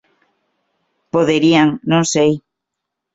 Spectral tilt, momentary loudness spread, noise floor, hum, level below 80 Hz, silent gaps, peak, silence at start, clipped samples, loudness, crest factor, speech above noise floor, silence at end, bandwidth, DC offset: -5 dB/octave; 7 LU; -79 dBFS; none; -56 dBFS; none; -2 dBFS; 1.15 s; under 0.1%; -15 LUFS; 16 dB; 66 dB; 0.75 s; 8 kHz; under 0.1%